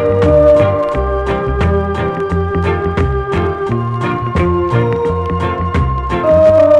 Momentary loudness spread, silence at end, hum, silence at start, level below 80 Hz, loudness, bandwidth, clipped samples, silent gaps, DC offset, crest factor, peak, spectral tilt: 8 LU; 0 s; none; 0 s; -24 dBFS; -14 LUFS; 9.2 kHz; under 0.1%; none; under 0.1%; 12 dB; 0 dBFS; -8.5 dB/octave